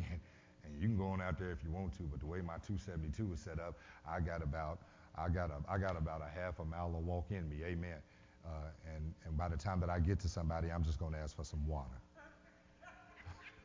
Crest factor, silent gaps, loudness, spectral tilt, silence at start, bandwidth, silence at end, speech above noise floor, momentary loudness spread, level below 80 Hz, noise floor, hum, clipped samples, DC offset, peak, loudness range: 18 dB; none; -43 LUFS; -7.5 dB/octave; 0 s; 7.6 kHz; 0 s; 24 dB; 15 LU; -48 dBFS; -65 dBFS; none; under 0.1%; under 0.1%; -24 dBFS; 4 LU